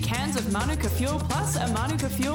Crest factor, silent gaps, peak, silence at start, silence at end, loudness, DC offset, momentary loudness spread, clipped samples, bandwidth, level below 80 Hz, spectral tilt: 12 dB; none; -14 dBFS; 0 s; 0 s; -26 LUFS; under 0.1%; 1 LU; under 0.1%; 19 kHz; -36 dBFS; -5 dB/octave